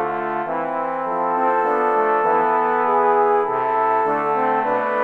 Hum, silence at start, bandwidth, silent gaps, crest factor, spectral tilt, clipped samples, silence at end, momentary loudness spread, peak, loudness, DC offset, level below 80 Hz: none; 0 s; 4.9 kHz; none; 14 dB; -7 dB/octave; under 0.1%; 0 s; 6 LU; -6 dBFS; -19 LUFS; under 0.1%; -70 dBFS